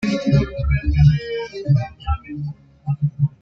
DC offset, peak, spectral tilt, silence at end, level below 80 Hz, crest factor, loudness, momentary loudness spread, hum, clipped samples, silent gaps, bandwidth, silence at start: under 0.1%; -2 dBFS; -8.5 dB/octave; 0.15 s; -28 dBFS; 16 dB; -20 LUFS; 15 LU; none; under 0.1%; none; 7 kHz; 0 s